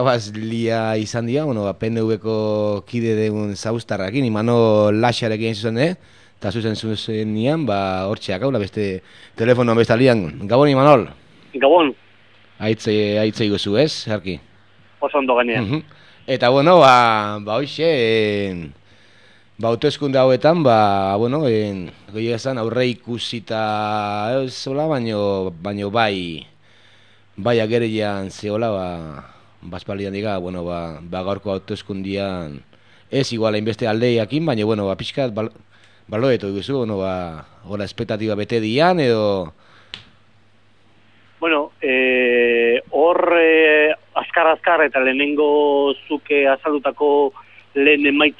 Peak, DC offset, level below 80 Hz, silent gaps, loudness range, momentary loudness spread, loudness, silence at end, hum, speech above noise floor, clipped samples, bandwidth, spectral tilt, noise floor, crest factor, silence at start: 0 dBFS; 0.2%; -54 dBFS; none; 8 LU; 13 LU; -18 LUFS; 0.05 s; none; 38 dB; under 0.1%; 11 kHz; -6 dB/octave; -56 dBFS; 18 dB; 0 s